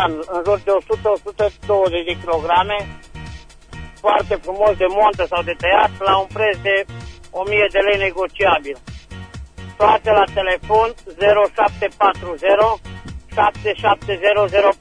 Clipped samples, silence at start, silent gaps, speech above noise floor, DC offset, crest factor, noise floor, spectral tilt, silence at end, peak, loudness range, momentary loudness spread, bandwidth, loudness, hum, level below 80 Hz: under 0.1%; 0 s; none; 19 dB; under 0.1%; 16 dB; -36 dBFS; -5 dB/octave; 0.05 s; -2 dBFS; 3 LU; 20 LU; 10 kHz; -17 LUFS; none; -40 dBFS